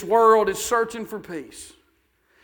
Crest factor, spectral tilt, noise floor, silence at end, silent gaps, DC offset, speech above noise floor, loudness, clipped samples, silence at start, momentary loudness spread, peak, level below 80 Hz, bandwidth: 18 dB; -3.5 dB/octave; -65 dBFS; 0.75 s; none; under 0.1%; 44 dB; -20 LUFS; under 0.1%; 0 s; 21 LU; -4 dBFS; -58 dBFS; 19.5 kHz